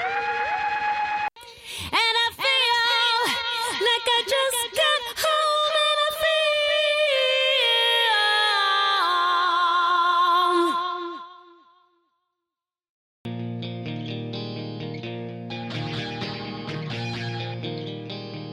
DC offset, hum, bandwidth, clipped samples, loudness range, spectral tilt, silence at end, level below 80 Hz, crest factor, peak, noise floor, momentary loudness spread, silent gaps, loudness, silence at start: under 0.1%; none; 16 kHz; under 0.1%; 15 LU; -3 dB/octave; 0 s; -62 dBFS; 16 dB; -8 dBFS; -88 dBFS; 15 LU; 12.89-13.25 s; -22 LUFS; 0 s